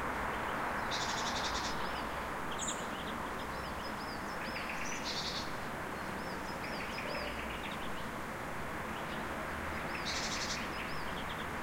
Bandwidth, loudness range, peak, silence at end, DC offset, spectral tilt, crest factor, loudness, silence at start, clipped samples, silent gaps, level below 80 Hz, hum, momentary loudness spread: 16.5 kHz; 3 LU; -22 dBFS; 0 s; under 0.1%; -3 dB/octave; 16 dB; -38 LUFS; 0 s; under 0.1%; none; -54 dBFS; none; 5 LU